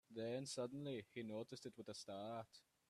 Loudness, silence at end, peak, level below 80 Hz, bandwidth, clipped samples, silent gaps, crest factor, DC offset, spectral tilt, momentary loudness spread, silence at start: -50 LUFS; 0.3 s; -34 dBFS; -88 dBFS; 13.5 kHz; under 0.1%; none; 16 dB; under 0.1%; -5 dB/octave; 7 LU; 0.1 s